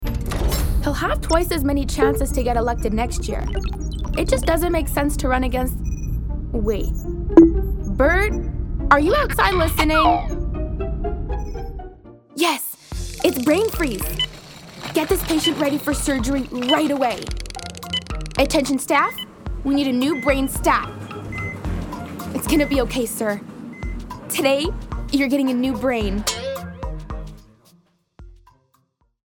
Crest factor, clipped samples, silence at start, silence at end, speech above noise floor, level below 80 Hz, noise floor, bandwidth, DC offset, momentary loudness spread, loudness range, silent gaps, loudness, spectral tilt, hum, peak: 20 dB; under 0.1%; 0 s; 0.95 s; 45 dB; -28 dBFS; -64 dBFS; over 20 kHz; under 0.1%; 14 LU; 5 LU; none; -21 LUFS; -5 dB/octave; none; 0 dBFS